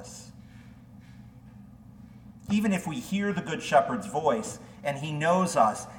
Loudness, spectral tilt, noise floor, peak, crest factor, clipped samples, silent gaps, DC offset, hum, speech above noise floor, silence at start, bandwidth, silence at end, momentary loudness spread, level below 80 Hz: -27 LUFS; -5.5 dB/octave; -49 dBFS; -10 dBFS; 20 dB; under 0.1%; none; under 0.1%; none; 22 dB; 0 s; 17.5 kHz; 0 s; 22 LU; -60 dBFS